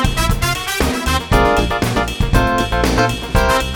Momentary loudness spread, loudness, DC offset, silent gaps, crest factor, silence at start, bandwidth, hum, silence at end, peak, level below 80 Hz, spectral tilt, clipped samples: 4 LU; -16 LUFS; under 0.1%; none; 16 dB; 0 s; 20 kHz; none; 0 s; 0 dBFS; -22 dBFS; -4.5 dB/octave; under 0.1%